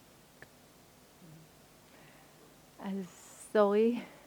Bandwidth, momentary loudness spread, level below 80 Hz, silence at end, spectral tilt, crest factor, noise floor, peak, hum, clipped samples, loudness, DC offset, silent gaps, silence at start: over 20 kHz; 28 LU; -74 dBFS; 0.2 s; -6 dB/octave; 24 dB; -60 dBFS; -12 dBFS; none; under 0.1%; -31 LUFS; under 0.1%; none; 2.8 s